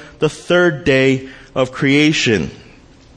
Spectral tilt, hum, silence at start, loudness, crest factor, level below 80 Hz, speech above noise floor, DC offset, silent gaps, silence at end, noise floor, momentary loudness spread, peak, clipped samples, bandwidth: -5 dB/octave; none; 0 s; -15 LUFS; 16 dB; -44 dBFS; 29 dB; under 0.1%; none; 0.6 s; -43 dBFS; 9 LU; 0 dBFS; under 0.1%; 10 kHz